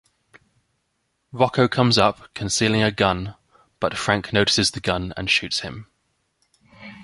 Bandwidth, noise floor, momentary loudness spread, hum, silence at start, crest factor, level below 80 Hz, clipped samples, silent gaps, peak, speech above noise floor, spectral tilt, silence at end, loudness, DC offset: 11.5 kHz; -72 dBFS; 15 LU; none; 1.35 s; 22 dB; -46 dBFS; under 0.1%; none; -2 dBFS; 52 dB; -4 dB/octave; 0 s; -20 LUFS; under 0.1%